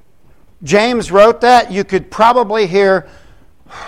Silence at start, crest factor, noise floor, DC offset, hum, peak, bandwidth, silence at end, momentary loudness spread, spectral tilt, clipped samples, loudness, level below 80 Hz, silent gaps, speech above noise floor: 0.6 s; 12 dB; -49 dBFS; 0.8%; none; 0 dBFS; 15 kHz; 0 s; 9 LU; -4.5 dB/octave; under 0.1%; -11 LUFS; -42 dBFS; none; 38 dB